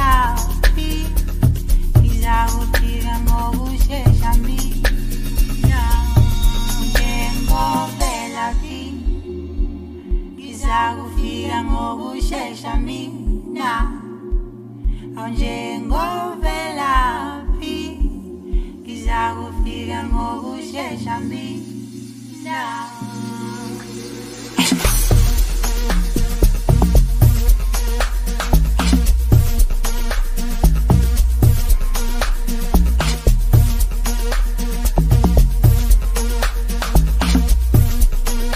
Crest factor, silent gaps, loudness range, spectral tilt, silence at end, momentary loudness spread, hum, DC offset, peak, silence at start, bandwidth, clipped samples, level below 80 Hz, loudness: 16 dB; none; 7 LU; -5 dB/octave; 0 s; 12 LU; none; under 0.1%; 0 dBFS; 0 s; 15.5 kHz; under 0.1%; -18 dBFS; -20 LUFS